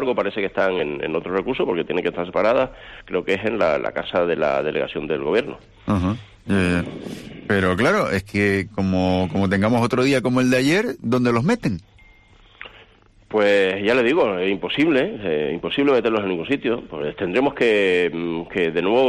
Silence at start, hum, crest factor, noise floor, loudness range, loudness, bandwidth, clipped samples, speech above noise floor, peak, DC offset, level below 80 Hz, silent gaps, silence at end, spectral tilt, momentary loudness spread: 0 s; none; 14 dB; -51 dBFS; 3 LU; -21 LUFS; 13 kHz; under 0.1%; 31 dB; -8 dBFS; under 0.1%; -50 dBFS; none; 0 s; -6 dB/octave; 9 LU